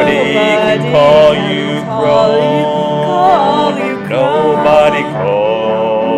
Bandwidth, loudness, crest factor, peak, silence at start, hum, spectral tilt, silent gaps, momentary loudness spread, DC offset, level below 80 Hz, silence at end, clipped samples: 10.5 kHz; -11 LUFS; 10 dB; 0 dBFS; 0 s; none; -6 dB/octave; none; 7 LU; under 0.1%; -44 dBFS; 0 s; 0.1%